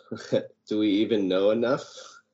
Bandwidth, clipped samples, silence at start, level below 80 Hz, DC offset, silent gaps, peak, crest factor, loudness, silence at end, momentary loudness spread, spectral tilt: 8 kHz; under 0.1%; 0.1 s; -70 dBFS; under 0.1%; none; -10 dBFS; 16 dB; -26 LUFS; 0.25 s; 10 LU; -4.5 dB/octave